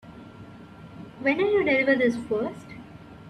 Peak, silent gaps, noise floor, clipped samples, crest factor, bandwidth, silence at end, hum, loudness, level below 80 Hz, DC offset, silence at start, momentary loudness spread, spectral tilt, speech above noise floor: -10 dBFS; none; -45 dBFS; under 0.1%; 18 dB; 10.5 kHz; 0 s; none; -24 LUFS; -60 dBFS; under 0.1%; 0.05 s; 24 LU; -6 dB/octave; 22 dB